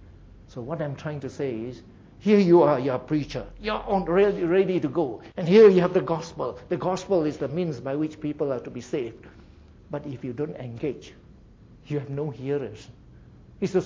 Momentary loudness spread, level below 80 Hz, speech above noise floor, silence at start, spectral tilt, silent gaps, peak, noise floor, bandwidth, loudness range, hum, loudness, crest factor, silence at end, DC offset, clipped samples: 17 LU; -52 dBFS; 26 dB; 0.05 s; -7.5 dB/octave; none; -6 dBFS; -50 dBFS; 7.6 kHz; 13 LU; none; -25 LUFS; 18 dB; 0 s; under 0.1%; under 0.1%